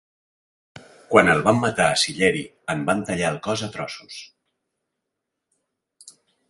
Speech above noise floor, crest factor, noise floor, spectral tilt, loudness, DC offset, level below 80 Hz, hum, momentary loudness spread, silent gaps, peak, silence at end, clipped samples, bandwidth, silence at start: 60 dB; 24 dB; -82 dBFS; -4 dB/octave; -21 LUFS; under 0.1%; -54 dBFS; none; 16 LU; none; 0 dBFS; 0.4 s; under 0.1%; 11.5 kHz; 1.1 s